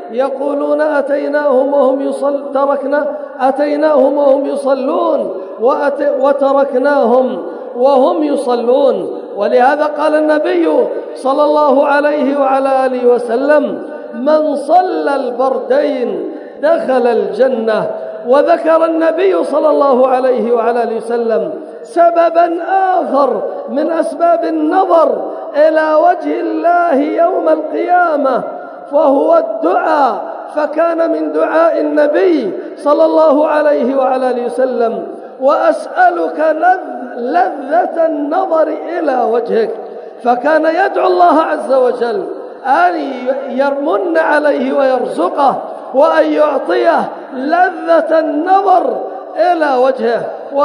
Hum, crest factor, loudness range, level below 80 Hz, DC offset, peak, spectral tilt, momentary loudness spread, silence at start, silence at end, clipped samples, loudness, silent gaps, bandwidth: none; 12 dB; 2 LU; -76 dBFS; under 0.1%; 0 dBFS; -5.5 dB/octave; 8 LU; 0 s; 0 s; under 0.1%; -13 LUFS; none; 11 kHz